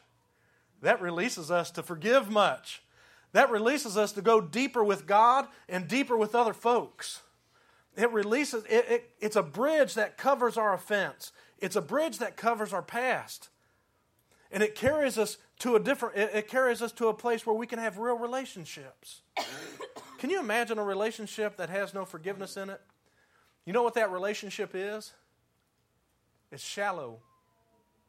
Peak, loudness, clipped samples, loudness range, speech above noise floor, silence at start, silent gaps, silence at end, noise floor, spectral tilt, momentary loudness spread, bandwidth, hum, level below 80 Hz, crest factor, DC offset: -6 dBFS; -29 LUFS; under 0.1%; 8 LU; 44 dB; 0.8 s; none; 0.9 s; -74 dBFS; -4 dB/octave; 16 LU; 16 kHz; none; -74 dBFS; 24 dB; under 0.1%